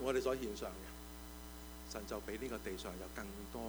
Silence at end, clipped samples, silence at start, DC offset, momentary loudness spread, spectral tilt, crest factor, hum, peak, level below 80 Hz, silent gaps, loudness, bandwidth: 0 s; under 0.1%; 0 s; under 0.1%; 13 LU; -4.5 dB/octave; 20 dB; none; -24 dBFS; -54 dBFS; none; -45 LUFS; over 20 kHz